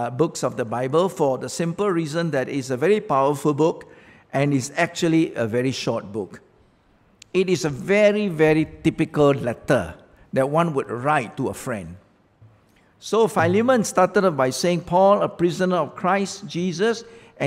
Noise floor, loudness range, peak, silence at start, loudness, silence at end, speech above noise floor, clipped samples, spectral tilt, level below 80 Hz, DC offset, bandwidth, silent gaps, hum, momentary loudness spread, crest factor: -58 dBFS; 4 LU; -4 dBFS; 0 s; -21 LUFS; 0 s; 37 dB; under 0.1%; -5.5 dB/octave; -56 dBFS; under 0.1%; 16 kHz; none; none; 10 LU; 18 dB